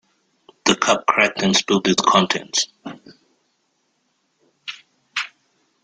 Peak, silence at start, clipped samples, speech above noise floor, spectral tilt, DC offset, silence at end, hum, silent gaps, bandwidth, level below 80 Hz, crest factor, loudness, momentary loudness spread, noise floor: 0 dBFS; 0.65 s; under 0.1%; 50 dB; -3 dB/octave; under 0.1%; 0.55 s; none; none; 9.6 kHz; -60 dBFS; 22 dB; -18 LUFS; 19 LU; -68 dBFS